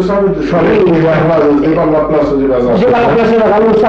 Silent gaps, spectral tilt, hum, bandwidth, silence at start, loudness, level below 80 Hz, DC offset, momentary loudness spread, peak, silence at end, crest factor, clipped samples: none; -8.5 dB/octave; none; 7.4 kHz; 0 s; -10 LUFS; -32 dBFS; under 0.1%; 3 LU; -2 dBFS; 0 s; 6 dB; under 0.1%